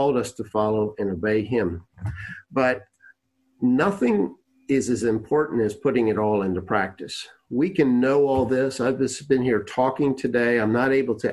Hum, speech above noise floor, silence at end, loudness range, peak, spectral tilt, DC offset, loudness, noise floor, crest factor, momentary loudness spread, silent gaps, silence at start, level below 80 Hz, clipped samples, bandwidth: none; 43 dB; 0 s; 4 LU; -6 dBFS; -6 dB/octave; under 0.1%; -23 LUFS; -65 dBFS; 18 dB; 9 LU; none; 0 s; -50 dBFS; under 0.1%; 12 kHz